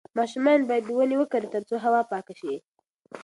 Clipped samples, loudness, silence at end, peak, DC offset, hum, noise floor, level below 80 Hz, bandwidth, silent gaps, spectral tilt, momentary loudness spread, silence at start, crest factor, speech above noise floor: under 0.1%; -25 LUFS; 0 s; -10 dBFS; under 0.1%; none; -47 dBFS; -78 dBFS; 11.5 kHz; 2.68-2.74 s, 2.89-2.99 s; -5.5 dB/octave; 13 LU; 0.15 s; 16 dB; 22 dB